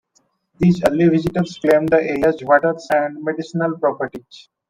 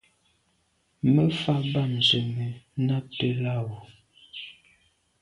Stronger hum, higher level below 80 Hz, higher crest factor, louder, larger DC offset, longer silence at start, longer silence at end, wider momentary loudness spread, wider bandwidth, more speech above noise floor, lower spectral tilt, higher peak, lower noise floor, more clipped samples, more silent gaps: neither; first, -50 dBFS vs -62 dBFS; about the same, 18 dB vs 18 dB; first, -18 LUFS vs -25 LUFS; neither; second, 0.6 s vs 1.05 s; second, 0.3 s vs 0.7 s; second, 9 LU vs 19 LU; first, 15.5 kHz vs 11 kHz; about the same, 46 dB vs 45 dB; about the same, -7.5 dB/octave vs -6.5 dB/octave; first, 0 dBFS vs -10 dBFS; second, -63 dBFS vs -70 dBFS; neither; neither